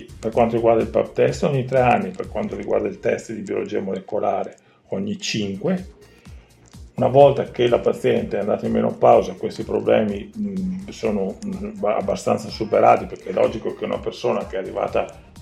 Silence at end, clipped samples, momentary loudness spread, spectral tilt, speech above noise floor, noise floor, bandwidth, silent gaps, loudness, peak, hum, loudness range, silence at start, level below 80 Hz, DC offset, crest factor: 0 s; under 0.1%; 12 LU; -6.5 dB/octave; 24 dB; -44 dBFS; 12.5 kHz; none; -21 LUFS; 0 dBFS; none; 7 LU; 0 s; -46 dBFS; under 0.1%; 20 dB